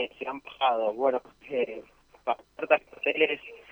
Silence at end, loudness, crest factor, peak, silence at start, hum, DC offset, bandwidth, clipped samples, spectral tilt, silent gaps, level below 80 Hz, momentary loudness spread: 0.1 s; -29 LUFS; 22 dB; -6 dBFS; 0 s; none; under 0.1%; over 20 kHz; under 0.1%; -5 dB/octave; none; -68 dBFS; 11 LU